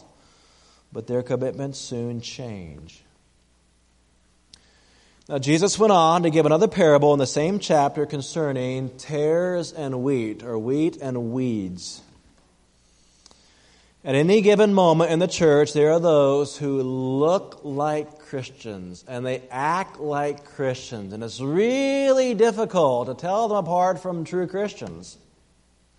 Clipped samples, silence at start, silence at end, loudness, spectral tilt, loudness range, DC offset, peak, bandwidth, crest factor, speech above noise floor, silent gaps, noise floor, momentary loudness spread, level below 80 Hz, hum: under 0.1%; 0.95 s; 0.85 s; -22 LUFS; -5.5 dB/octave; 12 LU; under 0.1%; -4 dBFS; 11 kHz; 18 dB; 39 dB; none; -61 dBFS; 17 LU; -60 dBFS; none